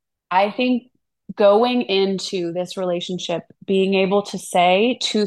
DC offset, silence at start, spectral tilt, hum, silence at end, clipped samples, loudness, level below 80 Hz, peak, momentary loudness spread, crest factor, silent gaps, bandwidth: under 0.1%; 0.3 s; -4.5 dB/octave; none; 0 s; under 0.1%; -19 LUFS; -70 dBFS; -4 dBFS; 10 LU; 16 dB; none; 12.5 kHz